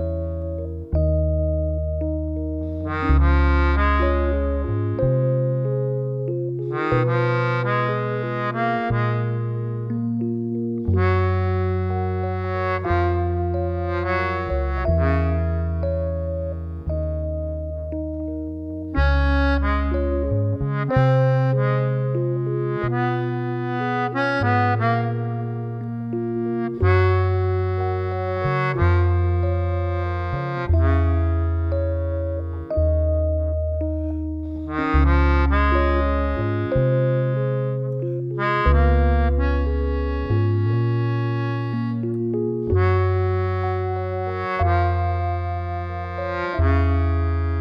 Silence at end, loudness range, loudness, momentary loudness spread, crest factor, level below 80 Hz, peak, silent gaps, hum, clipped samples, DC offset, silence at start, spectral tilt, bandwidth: 0 s; 3 LU; -22 LUFS; 8 LU; 16 dB; -26 dBFS; -4 dBFS; none; 50 Hz at -55 dBFS; under 0.1%; under 0.1%; 0 s; -9.5 dB/octave; 5.6 kHz